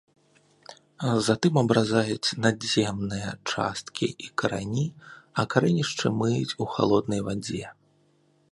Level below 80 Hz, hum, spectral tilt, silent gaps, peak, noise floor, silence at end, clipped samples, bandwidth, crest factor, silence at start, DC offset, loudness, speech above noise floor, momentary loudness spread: -58 dBFS; none; -5 dB/octave; none; -4 dBFS; -64 dBFS; 0.8 s; under 0.1%; 11.5 kHz; 24 dB; 0.7 s; under 0.1%; -26 LUFS; 39 dB; 9 LU